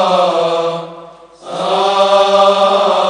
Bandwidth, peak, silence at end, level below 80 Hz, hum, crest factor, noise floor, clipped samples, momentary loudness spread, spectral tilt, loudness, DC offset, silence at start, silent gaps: 10.5 kHz; 0 dBFS; 0 s; -60 dBFS; none; 12 dB; -36 dBFS; under 0.1%; 14 LU; -4 dB/octave; -12 LUFS; under 0.1%; 0 s; none